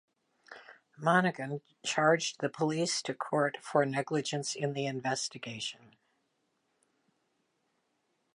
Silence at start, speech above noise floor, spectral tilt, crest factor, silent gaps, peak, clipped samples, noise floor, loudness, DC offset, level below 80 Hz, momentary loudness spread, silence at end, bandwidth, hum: 0.5 s; 46 dB; -4 dB/octave; 22 dB; none; -12 dBFS; under 0.1%; -78 dBFS; -32 LUFS; under 0.1%; -82 dBFS; 12 LU; 2.6 s; 11.5 kHz; none